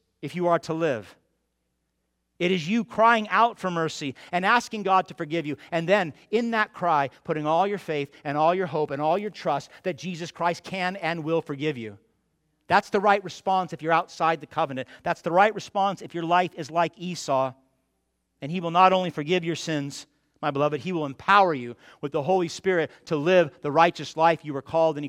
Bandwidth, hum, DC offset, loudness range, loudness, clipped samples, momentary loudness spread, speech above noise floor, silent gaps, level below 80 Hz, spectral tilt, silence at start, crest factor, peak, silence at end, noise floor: 14.5 kHz; none; under 0.1%; 4 LU; -25 LUFS; under 0.1%; 11 LU; 52 dB; none; -70 dBFS; -5.5 dB/octave; 0.2 s; 22 dB; -4 dBFS; 0 s; -76 dBFS